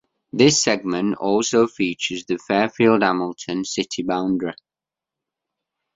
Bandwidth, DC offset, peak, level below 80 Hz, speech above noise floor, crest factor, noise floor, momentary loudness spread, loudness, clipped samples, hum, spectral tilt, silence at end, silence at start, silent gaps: 7.8 kHz; under 0.1%; -2 dBFS; -60 dBFS; 69 dB; 20 dB; -89 dBFS; 10 LU; -20 LUFS; under 0.1%; none; -4 dB/octave; 1.45 s; 0.35 s; none